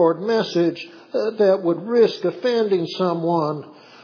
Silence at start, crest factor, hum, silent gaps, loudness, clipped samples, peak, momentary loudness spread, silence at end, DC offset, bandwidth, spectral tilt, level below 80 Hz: 0 s; 16 dB; none; none; -20 LUFS; under 0.1%; -4 dBFS; 8 LU; 0.3 s; under 0.1%; 5.4 kHz; -7 dB/octave; -84 dBFS